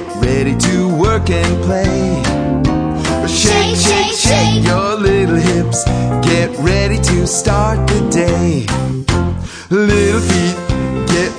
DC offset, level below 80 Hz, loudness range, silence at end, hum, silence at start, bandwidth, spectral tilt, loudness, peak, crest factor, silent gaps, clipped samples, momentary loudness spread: under 0.1%; -24 dBFS; 2 LU; 0 s; none; 0 s; 10.5 kHz; -5 dB/octave; -13 LUFS; 0 dBFS; 14 dB; none; under 0.1%; 5 LU